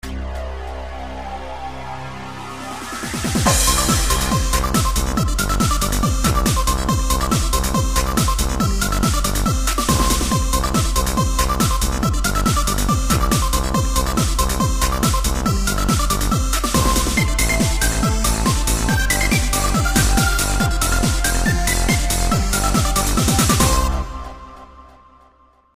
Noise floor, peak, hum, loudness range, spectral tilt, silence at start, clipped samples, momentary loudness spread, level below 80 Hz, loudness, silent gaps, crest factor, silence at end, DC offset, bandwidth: -53 dBFS; -2 dBFS; none; 2 LU; -4 dB/octave; 0.05 s; under 0.1%; 13 LU; -22 dBFS; -18 LUFS; none; 16 dB; 0.9 s; 0.2%; 15.5 kHz